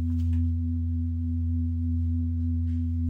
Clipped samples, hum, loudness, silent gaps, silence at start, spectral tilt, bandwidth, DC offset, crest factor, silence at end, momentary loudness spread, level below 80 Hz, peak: under 0.1%; none; -28 LUFS; none; 0 s; -11 dB/octave; 0.5 kHz; under 0.1%; 8 dB; 0 s; 2 LU; -32 dBFS; -18 dBFS